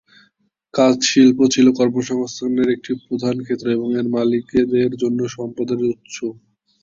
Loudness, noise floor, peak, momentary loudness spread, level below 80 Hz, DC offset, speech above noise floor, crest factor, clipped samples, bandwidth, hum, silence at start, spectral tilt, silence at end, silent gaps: -18 LUFS; -62 dBFS; -2 dBFS; 12 LU; -56 dBFS; under 0.1%; 45 dB; 16 dB; under 0.1%; 7.6 kHz; none; 0.75 s; -5 dB/octave; 0.5 s; none